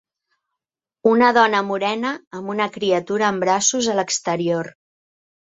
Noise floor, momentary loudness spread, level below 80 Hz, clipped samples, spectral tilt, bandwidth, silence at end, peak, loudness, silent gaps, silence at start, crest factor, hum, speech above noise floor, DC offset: -86 dBFS; 11 LU; -66 dBFS; under 0.1%; -3 dB/octave; 8.2 kHz; 0.8 s; -2 dBFS; -19 LUFS; 2.27-2.31 s; 1.05 s; 18 dB; none; 67 dB; under 0.1%